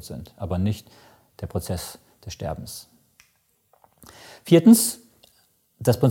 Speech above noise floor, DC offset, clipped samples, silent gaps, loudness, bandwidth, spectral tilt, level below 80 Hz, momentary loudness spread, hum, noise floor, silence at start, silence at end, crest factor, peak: 44 dB; under 0.1%; under 0.1%; none; -21 LUFS; 17 kHz; -6 dB/octave; -50 dBFS; 24 LU; none; -66 dBFS; 0.05 s; 0 s; 22 dB; -2 dBFS